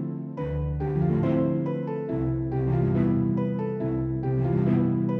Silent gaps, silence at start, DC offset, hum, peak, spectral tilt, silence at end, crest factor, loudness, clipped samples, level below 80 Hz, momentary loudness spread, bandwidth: none; 0 s; under 0.1%; none; -10 dBFS; -12 dB/octave; 0 s; 14 dB; -26 LUFS; under 0.1%; -42 dBFS; 6 LU; 3.9 kHz